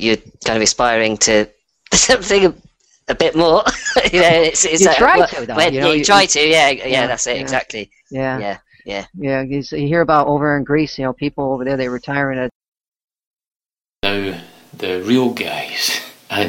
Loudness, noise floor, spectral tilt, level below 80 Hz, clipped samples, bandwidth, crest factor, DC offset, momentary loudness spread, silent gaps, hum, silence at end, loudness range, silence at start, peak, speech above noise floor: -15 LUFS; under -90 dBFS; -3 dB/octave; -42 dBFS; under 0.1%; 16.5 kHz; 16 dB; under 0.1%; 13 LU; 12.55-12.61 s, 12.68-12.72 s, 12.88-12.92 s, 13.04-13.08 s, 13.27-13.34 s, 13.56-13.60 s; none; 0 s; 10 LU; 0 s; 0 dBFS; over 75 dB